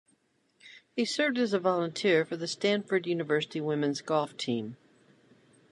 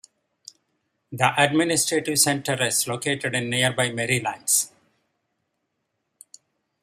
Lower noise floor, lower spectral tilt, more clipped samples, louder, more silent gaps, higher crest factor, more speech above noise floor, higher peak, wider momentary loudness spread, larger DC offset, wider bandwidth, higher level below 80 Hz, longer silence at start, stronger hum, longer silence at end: second, -71 dBFS vs -77 dBFS; first, -4.5 dB/octave vs -2.5 dB/octave; neither; second, -29 LUFS vs -22 LUFS; neither; second, 18 dB vs 24 dB; second, 42 dB vs 54 dB; second, -12 dBFS vs -2 dBFS; about the same, 7 LU vs 6 LU; neither; second, 11.5 kHz vs 15 kHz; second, -82 dBFS vs -66 dBFS; second, 0.65 s vs 1.1 s; neither; second, 0.95 s vs 2.15 s